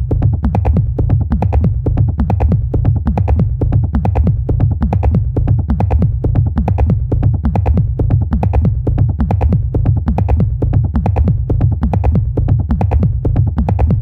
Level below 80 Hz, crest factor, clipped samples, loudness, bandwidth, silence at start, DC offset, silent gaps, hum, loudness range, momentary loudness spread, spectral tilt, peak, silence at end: -18 dBFS; 12 dB; under 0.1%; -15 LUFS; 3.7 kHz; 0 s; under 0.1%; none; none; 0 LU; 1 LU; -11.5 dB/octave; 0 dBFS; 0 s